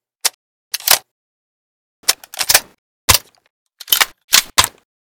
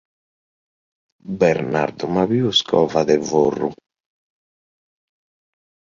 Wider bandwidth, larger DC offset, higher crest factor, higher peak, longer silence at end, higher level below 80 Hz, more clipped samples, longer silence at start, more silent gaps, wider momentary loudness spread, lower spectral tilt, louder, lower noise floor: first, over 20 kHz vs 7.4 kHz; neither; about the same, 20 dB vs 20 dB; about the same, 0 dBFS vs -2 dBFS; second, 0.5 s vs 2.2 s; first, -40 dBFS vs -56 dBFS; first, 0.4% vs under 0.1%; second, 0.25 s vs 1.25 s; first, 0.34-0.71 s, 1.11-2.03 s, 2.78-3.08 s, 3.50-3.66 s, 4.24-4.28 s vs none; about the same, 9 LU vs 7 LU; second, 0.5 dB/octave vs -5 dB/octave; first, -14 LUFS vs -18 LUFS; about the same, under -90 dBFS vs under -90 dBFS